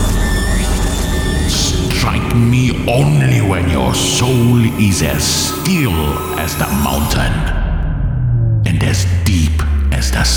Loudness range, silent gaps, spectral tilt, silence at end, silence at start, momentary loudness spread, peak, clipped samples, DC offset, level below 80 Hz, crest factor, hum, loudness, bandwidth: 3 LU; none; -5 dB/octave; 0 s; 0 s; 5 LU; -2 dBFS; under 0.1%; under 0.1%; -20 dBFS; 12 dB; none; -14 LUFS; 19 kHz